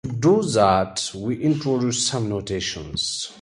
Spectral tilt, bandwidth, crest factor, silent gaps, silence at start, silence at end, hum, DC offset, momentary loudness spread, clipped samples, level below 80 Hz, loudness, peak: -4.5 dB/octave; 11.5 kHz; 18 dB; none; 0.05 s; 0.05 s; none; under 0.1%; 8 LU; under 0.1%; -48 dBFS; -22 LUFS; -4 dBFS